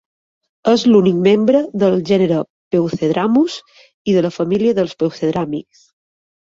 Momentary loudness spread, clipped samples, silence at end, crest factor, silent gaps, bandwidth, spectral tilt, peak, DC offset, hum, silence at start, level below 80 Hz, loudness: 10 LU; under 0.1%; 0.9 s; 14 dB; 2.50-2.71 s, 3.94-4.05 s; 7.8 kHz; -7 dB/octave; -2 dBFS; under 0.1%; none; 0.65 s; -56 dBFS; -16 LUFS